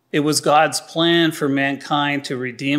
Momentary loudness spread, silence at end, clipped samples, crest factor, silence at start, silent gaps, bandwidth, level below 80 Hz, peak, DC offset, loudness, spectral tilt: 7 LU; 0 s; under 0.1%; 16 dB; 0.15 s; none; 16 kHz; -70 dBFS; -2 dBFS; under 0.1%; -18 LUFS; -4 dB/octave